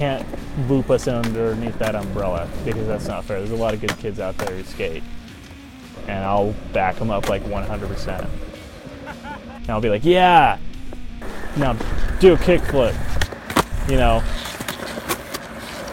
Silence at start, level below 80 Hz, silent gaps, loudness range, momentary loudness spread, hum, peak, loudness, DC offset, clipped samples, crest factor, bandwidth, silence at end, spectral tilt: 0 s; -30 dBFS; none; 8 LU; 20 LU; none; -2 dBFS; -21 LUFS; under 0.1%; under 0.1%; 18 dB; 17 kHz; 0 s; -5.5 dB/octave